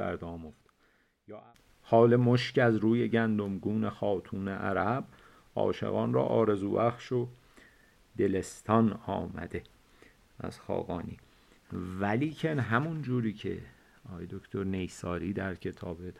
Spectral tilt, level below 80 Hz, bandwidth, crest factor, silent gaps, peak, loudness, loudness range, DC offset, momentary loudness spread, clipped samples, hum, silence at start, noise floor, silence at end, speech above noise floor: -7.5 dB/octave; -60 dBFS; 12 kHz; 22 dB; none; -10 dBFS; -31 LUFS; 8 LU; under 0.1%; 17 LU; under 0.1%; none; 0 s; -69 dBFS; 0.05 s; 39 dB